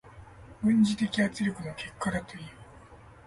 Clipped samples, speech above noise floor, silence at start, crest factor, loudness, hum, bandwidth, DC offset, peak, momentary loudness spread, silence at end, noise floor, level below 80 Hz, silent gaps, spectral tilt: under 0.1%; 23 dB; 0.05 s; 16 dB; -29 LUFS; none; 11.5 kHz; under 0.1%; -14 dBFS; 19 LU; 0.3 s; -51 dBFS; -56 dBFS; none; -5.5 dB/octave